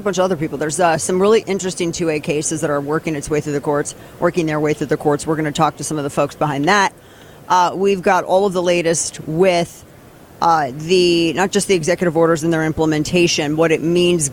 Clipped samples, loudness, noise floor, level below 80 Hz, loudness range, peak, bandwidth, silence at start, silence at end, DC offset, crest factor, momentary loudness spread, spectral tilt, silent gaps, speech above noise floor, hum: under 0.1%; -17 LUFS; -42 dBFS; -48 dBFS; 4 LU; -2 dBFS; 17 kHz; 0 s; 0 s; under 0.1%; 14 dB; 6 LU; -4.5 dB/octave; none; 25 dB; none